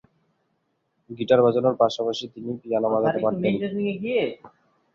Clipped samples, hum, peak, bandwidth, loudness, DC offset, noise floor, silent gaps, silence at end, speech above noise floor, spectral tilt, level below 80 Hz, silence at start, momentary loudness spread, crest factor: under 0.1%; none; -4 dBFS; 7.4 kHz; -23 LUFS; under 0.1%; -73 dBFS; none; 0.45 s; 50 dB; -6.5 dB/octave; -64 dBFS; 1.1 s; 14 LU; 20 dB